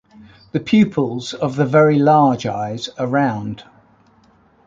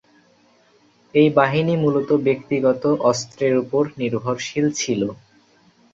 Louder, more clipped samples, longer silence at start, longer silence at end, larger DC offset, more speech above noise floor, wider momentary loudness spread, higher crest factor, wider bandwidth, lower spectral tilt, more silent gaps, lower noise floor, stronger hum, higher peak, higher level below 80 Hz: first, -17 LUFS vs -20 LUFS; neither; second, 0.55 s vs 1.15 s; first, 1.05 s vs 0.8 s; neither; about the same, 37 dB vs 38 dB; first, 13 LU vs 8 LU; about the same, 16 dB vs 18 dB; about the same, 7.6 kHz vs 7.8 kHz; first, -7 dB/octave vs -5.5 dB/octave; neither; second, -53 dBFS vs -57 dBFS; neither; about the same, -2 dBFS vs -2 dBFS; about the same, -56 dBFS vs -60 dBFS